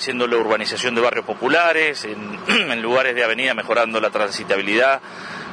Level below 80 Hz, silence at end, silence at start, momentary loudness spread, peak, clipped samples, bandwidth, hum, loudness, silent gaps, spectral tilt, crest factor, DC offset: -66 dBFS; 0 s; 0 s; 7 LU; -2 dBFS; under 0.1%; 10.5 kHz; none; -18 LUFS; none; -3 dB/octave; 18 dB; under 0.1%